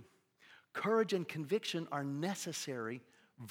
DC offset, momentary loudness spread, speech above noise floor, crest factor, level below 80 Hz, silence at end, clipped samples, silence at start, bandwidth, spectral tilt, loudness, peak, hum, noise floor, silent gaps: under 0.1%; 12 LU; 29 dB; 18 dB; under -90 dBFS; 0 s; under 0.1%; 0 s; 17.5 kHz; -4.5 dB/octave; -38 LUFS; -20 dBFS; none; -66 dBFS; none